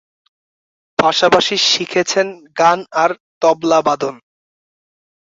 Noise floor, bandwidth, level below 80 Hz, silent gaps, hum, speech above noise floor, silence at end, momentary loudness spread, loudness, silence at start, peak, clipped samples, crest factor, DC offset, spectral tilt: under -90 dBFS; 7.8 kHz; -58 dBFS; 3.20-3.41 s; none; over 75 dB; 1.05 s; 8 LU; -15 LUFS; 1 s; 0 dBFS; under 0.1%; 16 dB; under 0.1%; -2.5 dB/octave